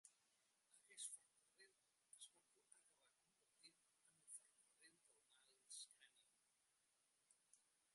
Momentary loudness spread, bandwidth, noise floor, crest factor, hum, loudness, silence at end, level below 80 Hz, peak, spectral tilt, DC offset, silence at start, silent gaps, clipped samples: 10 LU; 11.5 kHz; -86 dBFS; 28 dB; none; -60 LUFS; 0 s; under -90 dBFS; -42 dBFS; 2 dB/octave; under 0.1%; 0.05 s; none; under 0.1%